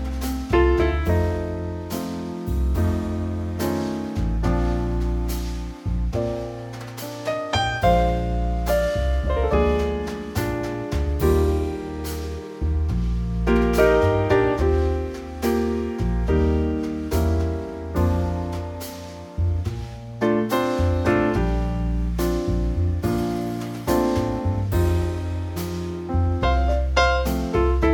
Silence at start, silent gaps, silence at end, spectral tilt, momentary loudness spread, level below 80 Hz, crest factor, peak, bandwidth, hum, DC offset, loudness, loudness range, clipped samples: 0 s; none; 0 s; -7 dB/octave; 10 LU; -28 dBFS; 16 dB; -4 dBFS; 17.5 kHz; none; under 0.1%; -23 LUFS; 4 LU; under 0.1%